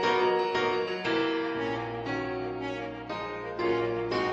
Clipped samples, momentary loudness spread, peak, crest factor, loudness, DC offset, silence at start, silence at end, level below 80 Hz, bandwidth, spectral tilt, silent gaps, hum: under 0.1%; 9 LU; -14 dBFS; 16 dB; -30 LUFS; under 0.1%; 0 s; 0 s; -58 dBFS; 8 kHz; -5.5 dB/octave; none; none